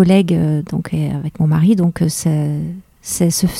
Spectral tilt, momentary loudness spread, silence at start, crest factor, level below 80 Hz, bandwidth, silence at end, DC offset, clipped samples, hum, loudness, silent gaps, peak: -6 dB/octave; 11 LU; 0 s; 16 dB; -42 dBFS; 16 kHz; 0 s; under 0.1%; under 0.1%; none; -16 LUFS; none; 0 dBFS